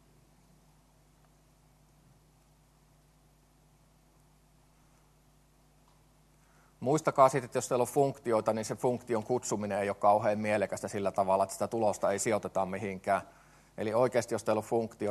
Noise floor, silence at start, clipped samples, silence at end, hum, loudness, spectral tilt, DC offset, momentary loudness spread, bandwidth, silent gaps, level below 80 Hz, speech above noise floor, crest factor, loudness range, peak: -64 dBFS; 6.8 s; under 0.1%; 0 s; none; -31 LUFS; -5.5 dB/octave; under 0.1%; 8 LU; 13 kHz; none; -68 dBFS; 34 dB; 24 dB; 3 LU; -8 dBFS